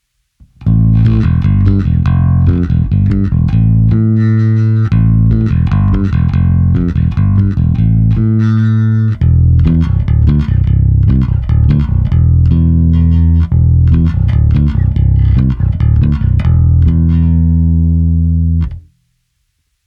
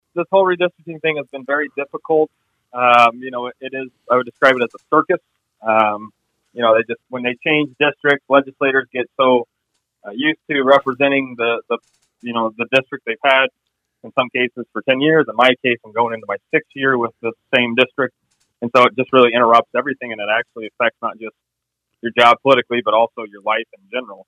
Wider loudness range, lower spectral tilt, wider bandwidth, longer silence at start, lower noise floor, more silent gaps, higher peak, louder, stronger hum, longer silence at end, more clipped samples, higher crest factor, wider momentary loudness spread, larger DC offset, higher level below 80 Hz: about the same, 1 LU vs 3 LU; first, -11 dB/octave vs -5.5 dB/octave; second, 4.5 kHz vs 10.5 kHz; first, 0.6 s vs 0.15 s; second, -63 dBFS vs -78 dBFS; neither; about the same, 0 dBFS vs 0 dBFS; first, -11 LUFS vs -17 LUFS; neither; first, 1.05 s vs 0.1 s; neither; second, 10 dB vs 18 dB; second, 3 LU vs 14 LU; neither; first, -16 dBFS vs -68 dBFS